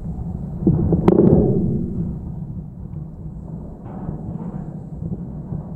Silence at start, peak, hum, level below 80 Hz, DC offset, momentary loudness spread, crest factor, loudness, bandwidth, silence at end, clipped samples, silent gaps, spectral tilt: 0 s; 0 dBFS; none; -34 dBFS; under 0.1%; 19 LU; 22 dB; -21 LUFS; 4.1 kHz; 0 s; under 0.1%; none; -12 dB/octave